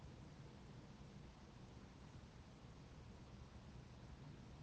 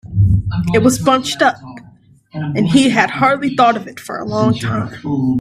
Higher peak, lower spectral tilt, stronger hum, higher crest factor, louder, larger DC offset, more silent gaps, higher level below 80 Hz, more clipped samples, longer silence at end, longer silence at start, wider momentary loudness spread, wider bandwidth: second, -46 dBFS vs 0 dBFS; about the same, -6 dB/octave vs -5.5 dB/octave; neither; about the same, 12 dB vs 14 dB; second, -60 LUFS vs -15 LUFS; neither; neither; second, -66 dBFS vs -36 dBFS; neither; about the same, 0 s vs 0 s; about the same, 0 s vs 0.05 s; second, 2 LU vs 12 LU; second, 8.8 kHz vs 15 kHz